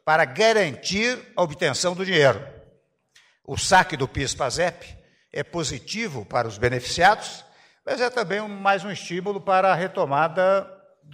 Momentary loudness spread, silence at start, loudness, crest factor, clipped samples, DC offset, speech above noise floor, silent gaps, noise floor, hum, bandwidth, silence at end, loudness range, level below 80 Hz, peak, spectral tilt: 12 LU; 0.05 s; -22 LUFS; 18 dB; under 0.1%; under 0.1%; 38 dB; none; -61 dBFS; none; 16 kHz; 0 s; 2 LU; -50 dBFS; -6 dBFS; -3.5 dB/octave